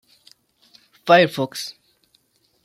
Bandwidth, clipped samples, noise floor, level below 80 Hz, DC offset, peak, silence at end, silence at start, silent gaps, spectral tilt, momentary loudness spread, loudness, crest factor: 15.5 kHz; under 0.1%; -63 dBFS; -72 dBFS; under 0.1%; -2 dBFS; 0.95 s; 1.05 s; none; -4.5 dB/octave; 18 LU; -18 LUFS; 20 dB